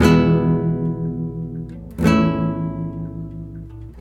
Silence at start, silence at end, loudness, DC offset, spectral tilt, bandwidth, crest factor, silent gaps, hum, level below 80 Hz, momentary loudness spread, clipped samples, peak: 0 s; 0 s; -20 LUFS; under 0.1%; -7.5 dB/octave; 12.5 kHz; 16 dB; none; none; -38 dBFS; 17 LU; under 0.1%; -2 dBFS